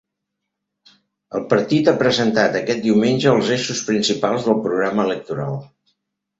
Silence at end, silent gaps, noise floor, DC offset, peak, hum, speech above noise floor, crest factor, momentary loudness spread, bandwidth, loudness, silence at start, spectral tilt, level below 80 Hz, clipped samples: 0.75 s; none; -79 dBFS; under 0.1%; -2 dBFS; none; 61 dB; 18 dB; 10 LU; 8 kHz; -18 LUFS; 1.3 s; -5 dB/octave; -58 dBFS; under 0.1%